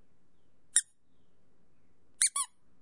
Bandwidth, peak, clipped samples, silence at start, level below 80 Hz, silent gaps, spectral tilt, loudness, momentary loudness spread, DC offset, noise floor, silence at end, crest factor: 11.5 kHz; -8 dBFS; under 0.1%; 0.75 s; -78 dBFS; none; 4 dB/octave; -29 LUFS; 7 LU; 0.2%; -73 dBFS; 0.35 s; 30 dB